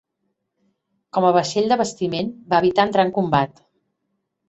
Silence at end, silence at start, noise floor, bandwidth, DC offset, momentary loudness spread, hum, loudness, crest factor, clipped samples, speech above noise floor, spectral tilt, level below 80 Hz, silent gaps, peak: 1 s; 1.15 s; -75 dBFS; 8.2 kHz; under 0.1%; 8 LU; none; -20 LUFS; 20 dB; under 0.1%; 56 dB; -5.5 dB/octave; -58 dBFS; none; -2 dBFS